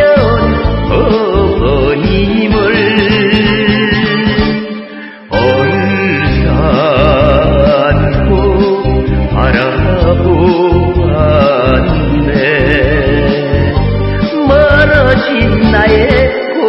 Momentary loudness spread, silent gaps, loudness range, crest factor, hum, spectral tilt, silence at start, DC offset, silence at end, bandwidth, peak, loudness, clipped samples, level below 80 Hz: 4 LU; none; 2 LU; 8 dB; none; -9 dB/octave; 0 s; under 0.1%; 0 s; 5.8 kHz; 0 dBFS; -10 LUFS; 0.2%; -18 dBFS